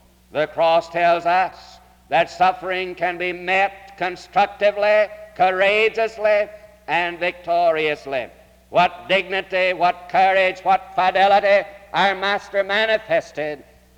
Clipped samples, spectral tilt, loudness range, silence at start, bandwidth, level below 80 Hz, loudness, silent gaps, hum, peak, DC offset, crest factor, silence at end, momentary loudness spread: under 0.1%; -4.5 dB/octave; 3 LU; 0.35 s; 12.5 kHz; -56 dBFS; -19 LUFS; none; none; -6 dBFS; under 0.1%; 14 dB; 0.4 s; 10 LU